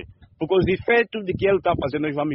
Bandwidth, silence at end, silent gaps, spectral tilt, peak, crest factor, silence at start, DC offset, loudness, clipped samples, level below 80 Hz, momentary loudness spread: 5.8 kHz; 0 s; none; -5 dB/octave; -6 dBFS; 16 dB; 0 s; under 0.1%; -21 LUFS; under 0.1%; -44 dBFS; 6 LU